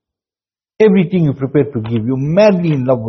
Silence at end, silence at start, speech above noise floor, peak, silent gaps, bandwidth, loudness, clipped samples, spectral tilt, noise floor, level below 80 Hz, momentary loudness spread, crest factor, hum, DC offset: 0 s; 0.8 s; over 77 dB; 0 dBFS; none; 6.2 kHz; -14 LUFS; under 0.1%; -8 dB/octave; under -90 dBFS; -50 dBFS; 7 LU; 14 dB; none; under 0.1%